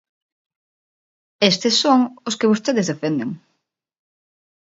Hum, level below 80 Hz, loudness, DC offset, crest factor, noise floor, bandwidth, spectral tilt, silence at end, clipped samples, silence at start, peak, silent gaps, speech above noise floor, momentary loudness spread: none; -68 dBFS; -18 LUFS; under 0.1%; 22 dB; -74 dBFS; 8 kHz; -4 dB/octave; 1.3 s; under 0.1%; 1.4 s; 0 dBFS; none; 56 dB; 10 LU